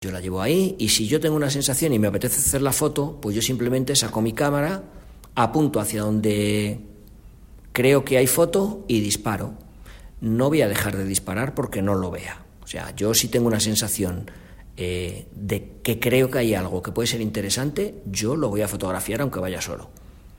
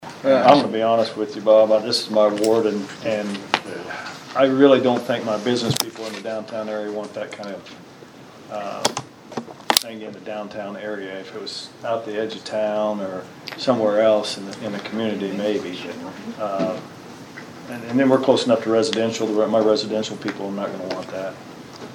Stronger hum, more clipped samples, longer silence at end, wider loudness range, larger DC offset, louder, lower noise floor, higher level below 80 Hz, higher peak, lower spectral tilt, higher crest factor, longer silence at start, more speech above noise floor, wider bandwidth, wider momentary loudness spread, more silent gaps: neither; neither; about the same, 0 s vs 0 s; second, 4 LU vs 8 LU; neither; about the same, -22 LUFS vs -21 LUFS; about the same, -45 dBFS vs -43 dBFS; first, -44 dBFS vs -66 dBFS; second, -4 dBFS vs 0 dBFS; about the same, -4 dB/octave vs -4.5 dB/octave; about the same, 20 dB vs 22 dB; about the same, 0 s vs 0 s; about the same, 23 dB vs 22 dB; second, 16.5 kHz vs over 20 kHz; second, 12 LU vs 17 LU; neither